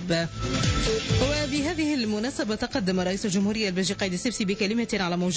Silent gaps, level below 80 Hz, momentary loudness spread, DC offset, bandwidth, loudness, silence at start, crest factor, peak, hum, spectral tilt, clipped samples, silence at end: none; -40 dBFS; 3 LU; under 0.1%; 8 kHz; -26 LUFS; 0 s; 12 dB; -14 dBFS; none; -4.5 dB/octave; under 0.1%; 0 s